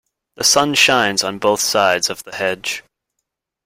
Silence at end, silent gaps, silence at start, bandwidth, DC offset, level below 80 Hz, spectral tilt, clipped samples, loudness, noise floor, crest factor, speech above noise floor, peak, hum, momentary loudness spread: 0.85 s; none; 0.4 s; 16.5 kHz; under 0.1%; -58 dBFS; -1.5 dB/octave; under 0.1%; -15 LUFS; -77 dBFS; 18 dB; 60 dB; 0 dBFS; none; 11 LU